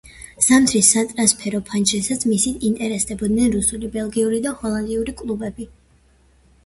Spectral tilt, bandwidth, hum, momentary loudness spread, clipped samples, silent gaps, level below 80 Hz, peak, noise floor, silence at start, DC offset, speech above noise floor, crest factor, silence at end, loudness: -3 dB/octave; 12 kHz; none; 13 LU; under 0.1%; none; -44 dBFS; 0 dBFS; -55 dBFS; 0.05 s; under 0.1%; 36 dB; 20 dB; 1 s; -18 LUFS